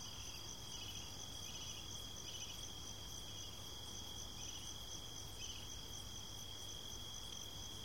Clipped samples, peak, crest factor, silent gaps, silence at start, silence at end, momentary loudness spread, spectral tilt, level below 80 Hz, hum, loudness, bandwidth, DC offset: under 0.1%; -36 dBFS; 14 dB; none; 0 s; 0 s; 2 LU; -2 dB/octave; -62 dBFS; none; -48 LUFS; 16 kHz; 0.2%